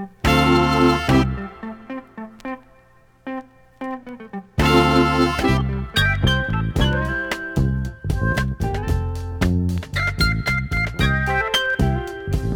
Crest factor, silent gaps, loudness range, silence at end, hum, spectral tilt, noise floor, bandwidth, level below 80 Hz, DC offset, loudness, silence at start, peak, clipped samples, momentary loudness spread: 16 dB; none; 6 LU; 0 s; none; -6 dB/octave; -52 dBFS; 19.5 kHz; -30 dBFS; under 0.1%; -20 LUFS; 0 s; -4 dBFS; under 0.1%; 18 LU